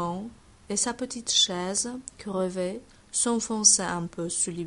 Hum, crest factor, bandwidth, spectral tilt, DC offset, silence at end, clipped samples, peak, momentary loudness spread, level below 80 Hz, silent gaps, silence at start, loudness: none; 22 dB; 11.5 kHz; -2 dB/octave; under 0.1%; 0 s; under 0.1%; -6 dBFS; 15 LU; -58 dBFS; none; 0 s; -25 LUFS